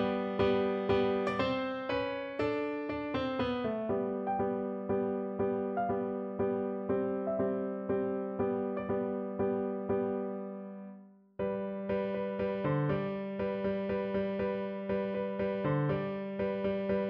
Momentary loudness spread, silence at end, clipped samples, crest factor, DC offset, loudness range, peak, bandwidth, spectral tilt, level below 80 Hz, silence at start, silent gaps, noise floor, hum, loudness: 5 LU; 0 s; under 0.1%; 16 dB; under 0.1%; 3 LU; -18 dBFS; 6 kHz; -9 dB/octave; -60 dBFS; 0 s; none; -53 dBFS; none; -34 LUFS